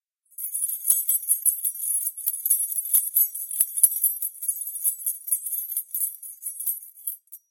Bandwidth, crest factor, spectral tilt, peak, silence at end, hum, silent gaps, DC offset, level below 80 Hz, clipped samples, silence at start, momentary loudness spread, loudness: 17.5 kHz; 24 dB; 3 dB/octave; -2 dBFS; 0.15 s; none; none; under 0.1%; -84 dBFS; under 0.1%; 0.4 s; 13 LU; -23 LUFS